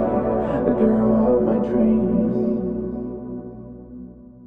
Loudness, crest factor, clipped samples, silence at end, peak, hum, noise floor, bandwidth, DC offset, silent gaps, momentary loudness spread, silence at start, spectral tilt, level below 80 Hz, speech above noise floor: -20 LUFS; 16 dB; under 0.1%; 0 s; -4 dBFS; none; -40 dBFS; 3.4 kHz; 0.3%; none; 21 LU; 0 s; -11.5 dB/octave; -42 dBFS; 22 dB